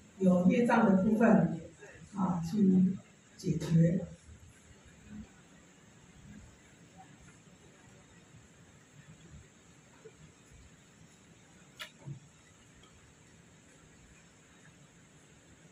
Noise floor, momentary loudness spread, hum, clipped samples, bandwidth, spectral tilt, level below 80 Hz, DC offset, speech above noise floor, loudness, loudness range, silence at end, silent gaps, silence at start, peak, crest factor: -60 dBFS; 28 LU; none; under 0.1%; 11.5 kHz; -8 dB/octave; -64 dBFS; under 0.1%; 33 dB; -29 LUFS; 27 LU; 3.55 s; none; 0.2 s; -14 dBFS; 20 dB